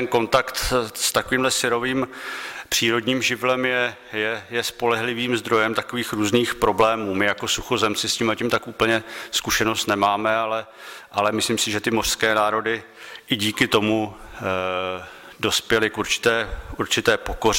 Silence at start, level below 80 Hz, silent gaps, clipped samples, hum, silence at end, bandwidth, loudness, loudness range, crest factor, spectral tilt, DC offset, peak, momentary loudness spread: 0 s; -44 dBFS; none; under 0.1%; none; 0 s; 16.5 kHz; -22 LUFS; 2 LU; 18 dB; -3 dB/octave; under 0.1%; -6 dBFS; 9 LU